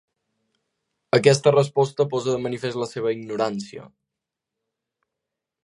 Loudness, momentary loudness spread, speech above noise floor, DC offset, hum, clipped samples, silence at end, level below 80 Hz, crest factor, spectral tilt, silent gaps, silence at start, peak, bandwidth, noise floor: -22 LUFS; 11 LU; 64 dB; under 0.1%; none; under 0.1%; 1.75 s; -68 dBFS; 22 dB; -5.5 dB/octave; none; 1.15 s; -2 dBFS; 11.5 kHz; -85 dBFS